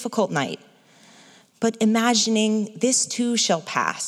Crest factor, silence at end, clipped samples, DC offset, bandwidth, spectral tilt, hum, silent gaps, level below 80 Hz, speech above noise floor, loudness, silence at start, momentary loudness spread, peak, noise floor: 18 dB; 0 s; under 0.1%; under 0.1%; 13.5 kHz; -3 dB/octave; none; none; -82 dBFS; 30 dB; -21 LUFS; 0 s; 8 LU; -4 dBFS; -52 dBFS